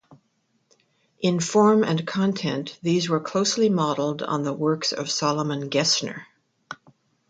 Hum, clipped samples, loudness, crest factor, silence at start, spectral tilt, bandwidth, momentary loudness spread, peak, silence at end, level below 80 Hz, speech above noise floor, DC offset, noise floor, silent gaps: none; under 0.1%; -23 LUFS; 18 dB; 0.1 s; -4.5 dB/octave; 9.4 kHz; 12 LU; -6 dBFS; 0.55 s; -68 dBFS; 47 dB; under 0.1%; -70 dBFS; none